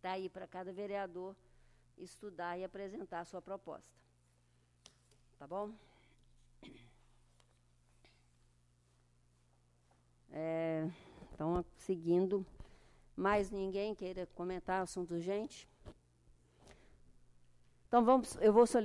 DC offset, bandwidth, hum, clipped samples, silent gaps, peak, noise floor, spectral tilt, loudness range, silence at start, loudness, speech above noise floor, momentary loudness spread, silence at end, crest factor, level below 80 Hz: under 0.1%; 12 kHz; 60 Hz at -70 dBFS; under 0.1%; none; -16 dBFS; -72 dBFS; -6 dB/octave; 15 LU; 0.05 s; -38 LUFS; 35 dB; 22 LU; 0 s; 24 dB; -64 dBFS